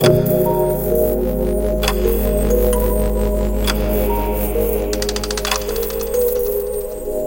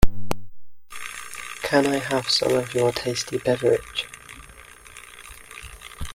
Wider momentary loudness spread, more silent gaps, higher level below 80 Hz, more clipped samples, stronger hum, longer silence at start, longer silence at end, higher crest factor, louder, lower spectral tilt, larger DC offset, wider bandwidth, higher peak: second, 4 LU vs 22 LU; neither; first, -24 dBFS vs -36 dBFS; neither; neither; about the same, 0 s vs 0 s; about the same, 0 s vs 0 s; about the same, 18 dB vs 22 dB; first, -18 LUFS vs -24 LUFS; about the same, -5 dB/octave vs -4 dB/octave; first, 0.4% vs under 0.1%; about the same, 17.5 kHz vs 16.5 kHz; about the same, 0 dBFS vs 0 dBFS